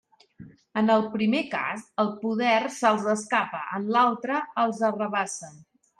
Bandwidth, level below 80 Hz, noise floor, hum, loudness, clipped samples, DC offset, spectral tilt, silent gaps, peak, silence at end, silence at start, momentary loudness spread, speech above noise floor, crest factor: 11.5 kHz; -74 dBFS; -49 dBFS; none; -25 LUFS; under 0.1%; under 0.1%; -4.5 dB/octave; none; -8 dBFS; 0.4 s; 0.4 s; 8 LU; 24 dB; 18 dB